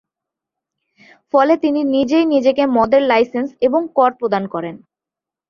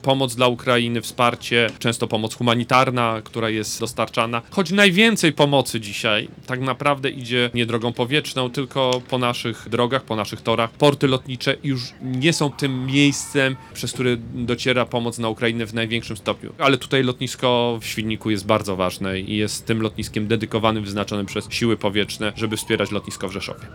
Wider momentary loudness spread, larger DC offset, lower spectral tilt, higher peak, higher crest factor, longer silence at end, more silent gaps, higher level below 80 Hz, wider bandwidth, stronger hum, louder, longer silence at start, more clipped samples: about the same, 7 LU vs 8 LU; neither; first, -6.5 dB/octave vs -4.5 dB/octave; about the same, -2 dBFS vs -2 dBFS; about the same, 16 dB vs 20 dB; first, 0.75 s vs 0 s; neither; second, -58 dBFS vs -52 dBFS; second, 7 kHz vs 18.5 kHz; neither; first, -16 LUFS vs -21 LUFS; first, 1.35 s vs 0 s; neither